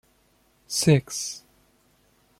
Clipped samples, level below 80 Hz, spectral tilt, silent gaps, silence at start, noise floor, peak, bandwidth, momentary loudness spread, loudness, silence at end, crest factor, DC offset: under 0.1%; -60 dBFS; -4.5 dB/octave; none; 0.7 s; -64 dBFS; -4 dBFS; 16 kHz; 14 LU; -24 LUFS; 1 s; 22 dB; under 0.1%